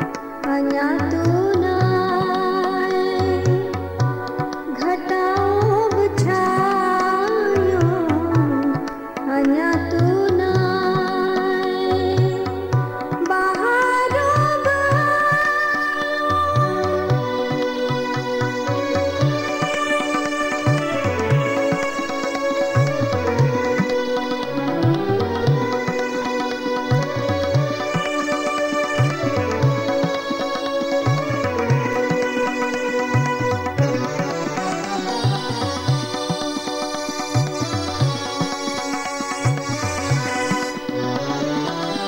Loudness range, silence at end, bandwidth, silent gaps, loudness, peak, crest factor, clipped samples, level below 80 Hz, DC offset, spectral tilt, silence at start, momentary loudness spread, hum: 4 LU; 0 s; 16.5 kHz; none; -20 LUFS; -6 dBFS; 14 dB; under 0.1%; -48 dBFS; under 0.1%; -6 dB/octave; 0 s; 6 LU; none